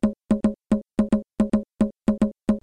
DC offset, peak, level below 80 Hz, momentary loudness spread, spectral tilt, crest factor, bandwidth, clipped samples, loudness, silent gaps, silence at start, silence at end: under 0.1%; -10 dBFS; -40 dBFS; 1 LU; -8.5 dB/octave; 12 dB; 9.8 kHz; under 0.1%; -24 LUFS; none; 0.05 s; 0.05 s